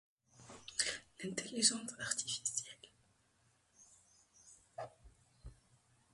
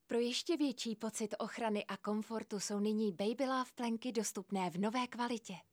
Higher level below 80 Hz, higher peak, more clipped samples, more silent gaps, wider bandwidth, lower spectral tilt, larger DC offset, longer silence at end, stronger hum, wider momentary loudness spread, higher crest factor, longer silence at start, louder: first, -70 dBFS vs -88 dBFS; first, -14 dBFS vs -24 dBFS; neither; neither; second, 11.5 kHz vs 16.5 kHz; second, -1 dB/octave vs -4 dB/octave; neither; first, 0.6 s vs 0.1 s; neither; first, 27 LU vs 5 LU; first, 30 dB vs 14 dB; first, 0.35 s vs 0.1 s; about the same, -37 LUFS vs -38 LUFS